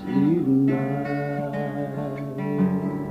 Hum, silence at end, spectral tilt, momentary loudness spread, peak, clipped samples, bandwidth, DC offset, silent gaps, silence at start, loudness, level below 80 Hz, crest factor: none; 0 s; -9.5 dB/octave; 9 LU; -10 dBFS; under 0.1%; 6 kHz; under 0.1%; none; 0 s; -24 LUFS; -56 dBFS; 12 dB